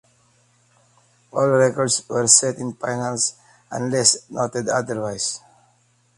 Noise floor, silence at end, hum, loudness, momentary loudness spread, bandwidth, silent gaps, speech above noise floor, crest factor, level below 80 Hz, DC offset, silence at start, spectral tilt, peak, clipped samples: -61 dBFS; 0.8 s; none; -19 LUFS; 14 LU; 11.5 kHz; none; 41 dB; 22 dB; -62 dBFS; under 0.1%; 1.35 s; -2.5 dB/octave; 0 dBFS; under 0.1%